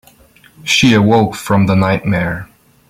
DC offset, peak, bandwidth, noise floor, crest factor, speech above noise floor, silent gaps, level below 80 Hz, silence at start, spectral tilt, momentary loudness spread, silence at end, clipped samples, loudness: under 0.1%; 0 dBFS; 16 kHz; -46 dBFS; 14 dB; 34 dB; none; -42 dBFS; 0.65 s; -5.5 dB/octave; 12 LU; 0.45 s; under 0.1%; -13 LUFS